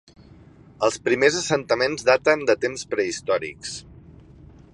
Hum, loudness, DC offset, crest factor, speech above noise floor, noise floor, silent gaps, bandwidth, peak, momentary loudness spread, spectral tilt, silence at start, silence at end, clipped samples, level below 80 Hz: none; -22 LUFS; under 0.1%; 22 dB; 27 dB; -48 dBFS; none; 11.5 kHz; -2 dBFS; 12 LU; -3.5 dB/octave; 0.8 s; 0.65 s; under 0.1%; -54 dBFS